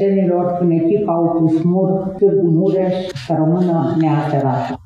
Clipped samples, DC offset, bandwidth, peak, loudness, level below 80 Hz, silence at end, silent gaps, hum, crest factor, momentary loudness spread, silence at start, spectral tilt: under 0.1%; under 0.1%; 7.6 kHz; -4 dBFS; -16 LUFS; -52 dBFS; 0.1 s; none; none; 12 dB; 4 LU; 0 s; -9.5 dB/octave